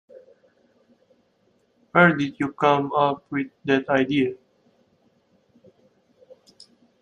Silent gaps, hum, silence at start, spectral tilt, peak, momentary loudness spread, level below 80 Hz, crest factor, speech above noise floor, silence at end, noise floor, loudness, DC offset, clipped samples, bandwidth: none; none; 1.95 s; -7 dB/octave; -2 dBFS; 11 LU; -68 dBFS; 24 dB; 44 dB; 2.65 s; -65 dBFS; -22 LUFS; under 0.1%; under 0.1%; 9.4 kHz